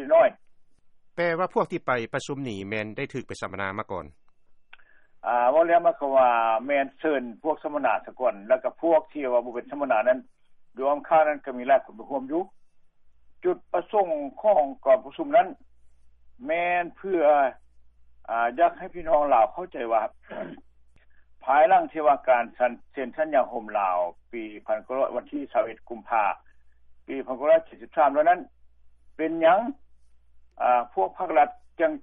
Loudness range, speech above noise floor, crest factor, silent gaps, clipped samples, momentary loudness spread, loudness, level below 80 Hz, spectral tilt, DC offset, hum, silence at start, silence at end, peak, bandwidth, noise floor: 5 LU; 29 dB; 16 dB; none; under 0.1%; 13 LU; -25 LUFS; -60 dBFS; -6 dB/octave; under 0.1%; none; 0 s; 0 s; -10 dBFS; 8.8 kHz; -53 dBFS